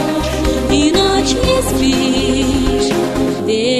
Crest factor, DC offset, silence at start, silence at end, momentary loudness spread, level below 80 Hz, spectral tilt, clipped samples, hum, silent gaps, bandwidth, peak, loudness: 12 dB; under 0.1%; 0 s; 0 s; 4 LU; -26 dBFS; -4.5 dB/octave; under 0.1%; none; none; 14 kHz; 0 dBFS; -14 LUFS